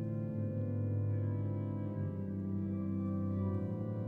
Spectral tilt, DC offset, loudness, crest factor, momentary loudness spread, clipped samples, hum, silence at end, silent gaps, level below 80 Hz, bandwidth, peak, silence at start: -12.5 dB/octave; under 0.1%; -37 LUFS; 10 dB; 3 LU; under 0.1%; none; 0 s; none; -68 dBFS; 2.6 kHz; -26 dBFS; 0 s